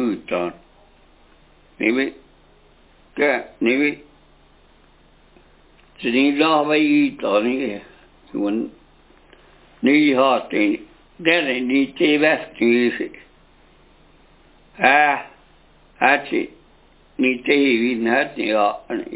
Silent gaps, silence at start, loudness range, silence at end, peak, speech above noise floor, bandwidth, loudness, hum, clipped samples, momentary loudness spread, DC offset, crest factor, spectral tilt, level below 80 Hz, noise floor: none; 0 s; 6 LU; 0 s; 0 dBFS; 34 dB; 4 kHz; -19 LUFS; none; under 0.1%; 12 LU; under 0.1%; 22 dB; -8.5 dB/octave; -58 dBFS; -52 dBFS